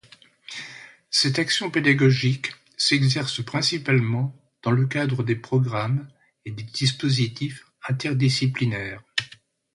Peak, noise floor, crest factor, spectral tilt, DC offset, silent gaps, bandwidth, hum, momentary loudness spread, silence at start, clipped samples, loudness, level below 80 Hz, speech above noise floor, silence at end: -6 dBFS; -51 dBFS; 18 dB; -5 dB/octave; under 0.1%; none; 11.5 kHz; none; 16 LU; 0.5 s; under 0.1%; -23 LUFS; -58 dBFS; 29 dB; 0.5 s